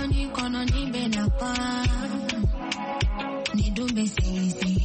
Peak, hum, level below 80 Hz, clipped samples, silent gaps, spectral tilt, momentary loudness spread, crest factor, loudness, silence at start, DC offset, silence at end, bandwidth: -12 dBFS; none; -30 dBFS; under 0.1%; none; -5 dB/octave; 3 LU; 12 dB; -27 LUFS; 0 s; under 0.1%; 0 s; 8.8 kHz